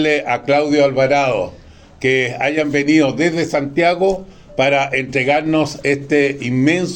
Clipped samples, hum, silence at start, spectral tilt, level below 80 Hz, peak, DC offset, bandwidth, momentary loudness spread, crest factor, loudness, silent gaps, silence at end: under 0.1%; none; 0 s; -5.5 dB/octave; -48 dBFS; 0 dBFS; under 0.1%; 9.2 kHz; 5 LU; 16 dB; -16 LUFS; none; 0 s